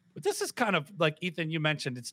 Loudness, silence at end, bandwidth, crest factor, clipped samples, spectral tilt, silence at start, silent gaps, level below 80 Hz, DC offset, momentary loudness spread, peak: -30 LUFS; 0 s; 16.5 kHz; 20 dB; under 0.1%; -4.5 dB/octave; 0.15 s; none; -88 dBFS; under 0.1%; 5 LU; -12 dBFS